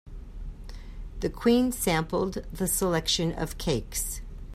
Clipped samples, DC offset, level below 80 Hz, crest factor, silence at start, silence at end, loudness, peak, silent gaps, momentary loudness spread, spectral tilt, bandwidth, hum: under 0.1%; under 0.1%; -40 dBFS; 18 dB; 0.05 s; 0 s; -27 LUFS; -12 dBFS; none; 20 LU; -4 dB/octave; 16 kHz; none